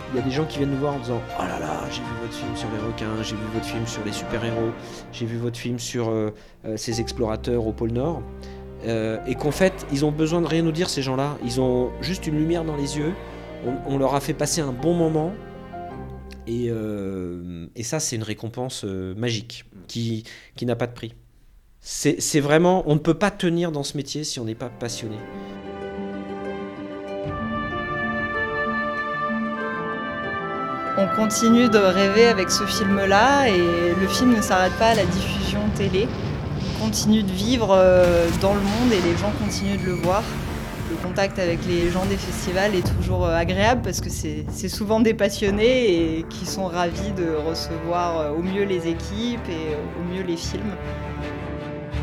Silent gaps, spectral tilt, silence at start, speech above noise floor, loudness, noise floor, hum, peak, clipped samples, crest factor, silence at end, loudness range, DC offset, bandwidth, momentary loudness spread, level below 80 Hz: none; -5 dB/octave; 0 s; 30 dB; -23 LUFS; -52 dBFS; none; -4 dBFS; under 0.1%; 20 dB; 0 s; 10 LU; under 0.1%; 17.5 kHz; 14 LU; -40 dBFS